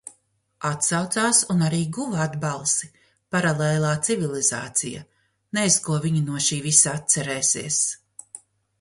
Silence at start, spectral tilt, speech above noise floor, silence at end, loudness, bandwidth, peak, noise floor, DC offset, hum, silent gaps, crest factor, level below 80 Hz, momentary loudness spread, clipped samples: 0.05 s; -3.5 dB/octave; 41 dB; 0.45 s; -21 LUFS; 11.5 kHz; 0 dBFS; -64 dBFS; under 0.1%; none; none; 24 dB; -60 dBFS; 11 LU; under 0.1%